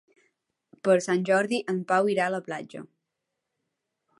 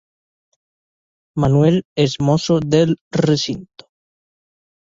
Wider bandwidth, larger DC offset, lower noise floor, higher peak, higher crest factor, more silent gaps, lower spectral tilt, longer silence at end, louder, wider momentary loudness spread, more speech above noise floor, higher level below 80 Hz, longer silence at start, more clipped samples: first, 11.5 kHz vs 7.8 kHz; neither; second, -83 dBFS vs under -90 dBFS; second, -8 dBFS vs -2 dBFS; about the same, 20 dB vs 16 dB; second, none vs 1.85-1.96 s, 3.01-3.11 s; second, -5 dB/octave vs -6.5 dB/octave; about the same, 1.35 s vs 1.3 s; second, -26 LUFS vs -17 LUFS; first, 13 LU vs 8 LU; second, 58 dB vs over 74 dB; second, -80 dBFS vs -48 dBFS; second, 0.85 s vs 1.35 s; neither